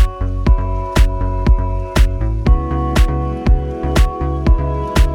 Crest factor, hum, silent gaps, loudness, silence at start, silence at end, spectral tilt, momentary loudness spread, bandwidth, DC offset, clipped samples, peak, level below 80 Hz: 14 dB; none; none; -17 LUFS; 0 s; 0 s; -6.5 dB/octave; 2 LU; 14 kHz; under 0.1%; under 0.1%; 0 dBFS; -14 dBFS